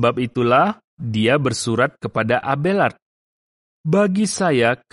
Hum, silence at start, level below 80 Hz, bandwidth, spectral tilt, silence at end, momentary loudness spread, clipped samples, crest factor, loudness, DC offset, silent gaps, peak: none; 0 s; -58 dBFS; 11.5 kHz; -5.5 dB/octave; 0.15 s; 5 LU; under 0.1%; 16 dB; -19 LUFS; under 0.1%; 0.84-0.97 s, 3.02-3.84 s; -4 dBFS